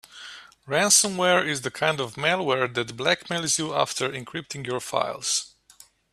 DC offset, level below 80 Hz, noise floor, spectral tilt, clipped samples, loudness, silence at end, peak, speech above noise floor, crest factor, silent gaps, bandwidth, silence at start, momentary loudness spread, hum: under 0.1%; -66 dBFS; -55 dBFS; -2 dB/octave; under 0.1%; -24 LUFS; 0.65 s; -4 dBFS; 30 dB; 22 dB; none; 15 kHz; 0.1 s; 16 LU; none